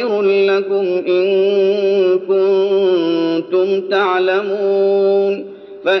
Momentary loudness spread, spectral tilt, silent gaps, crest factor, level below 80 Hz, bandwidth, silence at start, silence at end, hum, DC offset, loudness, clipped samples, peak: 4 LU; -7 dB/octave; none; 12 dB; -72 dBFS; 6 kHz; 0 s; 0 s; none; under 0.1%; -15 LUFS; under 0.1%; -2 dBFS